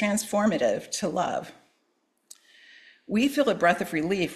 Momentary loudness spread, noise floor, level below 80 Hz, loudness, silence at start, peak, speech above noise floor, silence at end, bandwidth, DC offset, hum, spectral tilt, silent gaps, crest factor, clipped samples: 7 LU; -72 dBFS; -64 dBFS; -26 LUFS; 0 s; -8 dBFS; 47 dB; 0 s; 14.5 kHz; under 0.1%; none; -4.5 dB/octave; none; 20 dB; under 0.1%